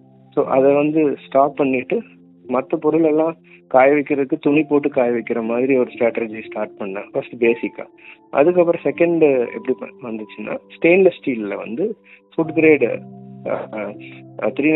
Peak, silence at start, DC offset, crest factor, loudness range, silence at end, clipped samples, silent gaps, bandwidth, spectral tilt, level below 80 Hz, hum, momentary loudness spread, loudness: 0 dBFS; 0.35 s; under 0.1%; 18 dB; 3 LU; 0 s; under 0.1%; none; 4.1 kHz; -11.5 dB/octave; -66 dBFS; none; 15 LU; -18 LUFS